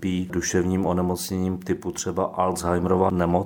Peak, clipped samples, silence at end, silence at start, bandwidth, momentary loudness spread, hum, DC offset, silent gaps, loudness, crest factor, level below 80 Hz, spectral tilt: -6 dBFS; under 0.1%; 0 s; 0 s; 19 kHz; 6 LU; none; under 0.1%; none; -24 LUFS; 18 dB; -48 dBFS; -5.5 dB/octave